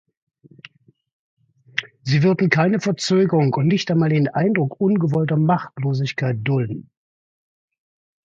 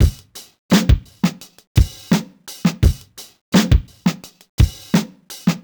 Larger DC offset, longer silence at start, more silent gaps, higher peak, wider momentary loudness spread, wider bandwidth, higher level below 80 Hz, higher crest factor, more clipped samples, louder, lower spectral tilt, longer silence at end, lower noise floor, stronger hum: neither; first, 1.75 s vs 0 s; second, none vs 0.59-0.69 s, 1.67-1.75 s, 3.41-3.52 s, 4.49-4.58 s; about the same, 0 dBFS vs 0 dBFS; second, 9 LU vs 21 LU; second, 7.8 kHz vs over 20 kHz; second, -60 dBFS vs -22 dBFS; about the same, 20 dB vs 18 dB; neither; about the same, -19 LUFS vs -19 LUFS; about the same, -7 dB/octave vs -6 dB/octave; first, 1.45 s vs 0.05 s; first, -48 dBFS vs -37 dBFS; neither